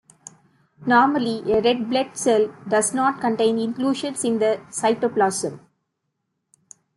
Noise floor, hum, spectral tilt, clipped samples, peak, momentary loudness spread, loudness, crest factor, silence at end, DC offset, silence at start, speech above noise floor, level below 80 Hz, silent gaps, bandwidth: -77 dBFS; none; -3.5 dB/octave; under 0.1%; -4 dBFS; 6 LU; -21 LUFS; 18 dB; 1.4 s; under 0.1%; 0.8 s; 56 dB; -62 dBFS; none; 12.5 kHz